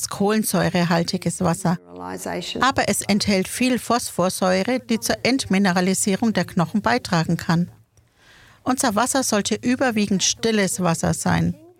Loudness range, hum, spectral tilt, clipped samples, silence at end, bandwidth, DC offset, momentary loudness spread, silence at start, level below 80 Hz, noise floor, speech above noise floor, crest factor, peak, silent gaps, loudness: 2 LU; none; -4.5 dB/octave; under 0.1%; 0.25 s; 16.5 kHz; under 0.1%; 5 LU; 0 s; -50 dBFS; -56 dBFS; 35 dB; 20 dB; -2 dBFS; none; -21 LUFS